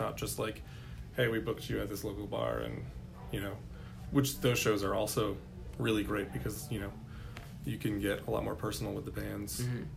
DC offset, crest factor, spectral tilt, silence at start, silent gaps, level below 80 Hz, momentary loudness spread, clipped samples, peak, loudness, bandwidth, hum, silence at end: under 0.1%; 20 dB; -5 dB/octave; 0 s; none; -50 dBFS; 16 LU; under 0.1%; -16 dBFS; -35 LUFS; 16 kHz; none; 0 s